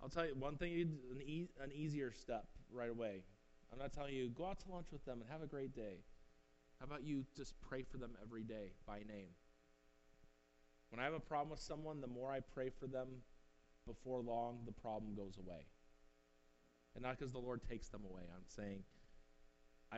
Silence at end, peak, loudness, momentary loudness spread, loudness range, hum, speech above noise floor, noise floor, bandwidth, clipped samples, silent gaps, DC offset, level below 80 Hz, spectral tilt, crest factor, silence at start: 0 s; -28 dBFS; -49 LUFS; 12 LU; 4 LU; none; 26 dB; -74 dBFS; 8 kHz; under 0.1%; none; under 0.1%; -62 dBFS; -5.5 dB/octave; 22 dB; 0 s